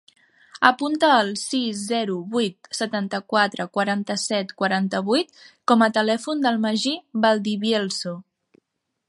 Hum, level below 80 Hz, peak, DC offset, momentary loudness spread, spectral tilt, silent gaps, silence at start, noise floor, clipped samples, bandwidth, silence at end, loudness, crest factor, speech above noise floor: none; -74 dBFS; 0 dBFS; under 0.1%; 9 LU; -4 dB/octave; none; 0.55 s; -68 dBFS; under 0.1%; 11.5 kHz; 0.85 s; -22 LUFS; 22 dB; 46 dB